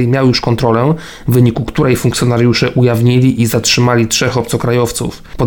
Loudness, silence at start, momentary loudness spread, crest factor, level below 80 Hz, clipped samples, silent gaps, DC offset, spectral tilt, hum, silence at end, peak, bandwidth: -12 LUFS; 0 s; 5 LU; 12 dB; -34 dBFS; under 0.1%; none; under 0.1%; -5.5 dB/octave; none; 0 s; 0 dBFS; 19 kHz